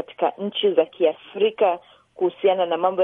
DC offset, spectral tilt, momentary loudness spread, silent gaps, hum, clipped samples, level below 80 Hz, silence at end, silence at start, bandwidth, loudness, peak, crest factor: under 0.1%; -8 dB/octave; 6 LU; none; none; under 0.1%; -76 dBFS; 0 s; 0 s; 3.9 kHz; -22 LUFS; -4 dBFS; 18 dB